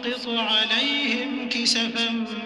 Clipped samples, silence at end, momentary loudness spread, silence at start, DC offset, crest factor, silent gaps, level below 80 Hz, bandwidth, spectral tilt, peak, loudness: under 0.1%; 0 s; 6 LU; 0 s; under 0.1%; 16 dB; none; -64 dBFS; 12 kHz; -1.5 dB/octave; -8 dBFS; -22 LUFS